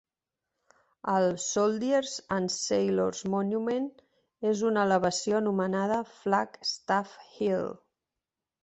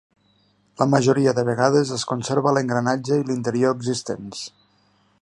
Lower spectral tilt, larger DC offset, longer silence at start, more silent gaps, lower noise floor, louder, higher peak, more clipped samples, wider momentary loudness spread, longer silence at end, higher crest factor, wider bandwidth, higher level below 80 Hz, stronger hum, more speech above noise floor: about the same, -4.5 dB/octave vs -5.5 dB/octave; neither; first, 1.05 s vs 0.8 s; neither; first, -89 dBFS vs -62 dBFS; second, -29 LUFS vs -21 LUFS; second, -10 dBFS vs -2 dBFS; neither; second, 7 LU vs 12 LU; first, 0.9 s vs 0.75 s; about the same, 18 dB vs 20 dB; second, 8.4 kHz vs 11.5 kHz; second, -68 dBFS vs -62 dBFS; second, none vs 50 Hz at -55 dBFS; first, 61 dB vs 41 dB